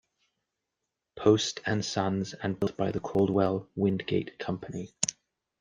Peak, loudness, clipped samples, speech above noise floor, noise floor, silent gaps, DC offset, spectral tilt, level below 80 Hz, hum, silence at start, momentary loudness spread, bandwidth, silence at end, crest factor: -8 dBFS; -29 LUFS; under 0.1%; 57 dB; -86 dBFS; none; under 0.1%; -5 dB/octave; -62 dBFS; none; 1.15 s; 10 LU; 10 kHz; 0.5 s; 22 dB